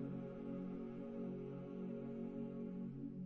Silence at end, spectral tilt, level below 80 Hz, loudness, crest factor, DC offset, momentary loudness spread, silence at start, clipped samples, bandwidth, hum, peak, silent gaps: 0 s; -10 dB/octave; -68 dBFS; -48 LUFS; 12 dB; under 0.1%; 2 LU; 0 s; under 0.1%; 4.3 kHz; none; -36 dBFS; none